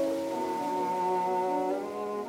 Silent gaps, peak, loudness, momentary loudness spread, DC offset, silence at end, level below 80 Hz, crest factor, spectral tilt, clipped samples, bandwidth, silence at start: none; -20 dBFS; -30 LUFS; 4 LU; under 0.1%; 0 s; -72 dBFS; 10 dB; -5.5 dB/octave; under 0.1%; 17 kHz; 0 s